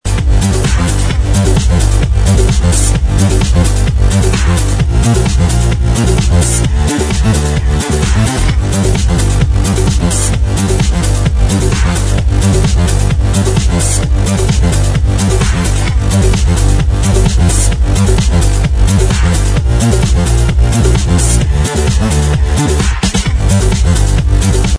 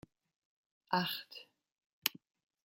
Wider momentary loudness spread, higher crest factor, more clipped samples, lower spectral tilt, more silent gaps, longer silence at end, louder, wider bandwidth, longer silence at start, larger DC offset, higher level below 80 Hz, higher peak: second, 2 LU vs 16 LU; second, 10 dB vs 34 dB; first, 0.1% vs under 0.1%; first, -5 dB/octave vs -3 dB/octave; second, none vs 1.86-2.02 s; second, 0 s vs 0.55 s; first, -11 LUFS vs -37 LUFS; second, 11 kHz vs 16.5 kHz; second, 0.05 s vs 0.9 s; neither; first, -12 dBFS vs -82 dBFS; first, 0 dBFS vs -8 dBFS